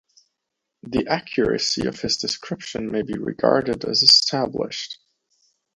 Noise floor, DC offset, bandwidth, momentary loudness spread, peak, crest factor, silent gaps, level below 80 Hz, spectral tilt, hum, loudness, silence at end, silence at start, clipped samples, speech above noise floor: -81 dBFS; under 0.1%; 11 kHz; 16 LU; 0 dBFS; 22 dB; none; -52 dBFS; -3 dB/octave; none; -20 LUFS; 0.8 s; 0.85 s; under 0.1%; 59 dB